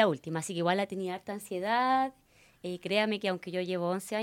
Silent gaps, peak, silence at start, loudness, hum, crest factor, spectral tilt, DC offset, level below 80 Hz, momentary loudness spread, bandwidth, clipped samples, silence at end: none; -10 dBFS; 0 s; -31 LUFS; none; 22 dB; -5 dB/octave; under 0.1%; -76 dBFS; 10 LU; 17.5 kHz; under 0.1%; 0 s